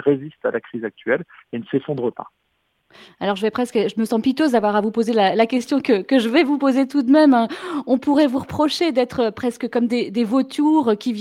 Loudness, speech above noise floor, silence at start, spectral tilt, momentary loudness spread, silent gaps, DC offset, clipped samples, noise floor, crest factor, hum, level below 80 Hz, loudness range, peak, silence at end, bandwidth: -19 LUFS; 43 dB; 0 s; -5.5 dB/octave; 9 LU; none; under 0.1%; under 0.1%; -62 dBFS; 16 dB; none; -60 dBFS; 8 LU; -4 dBFS; 0 s; 13.5 kHz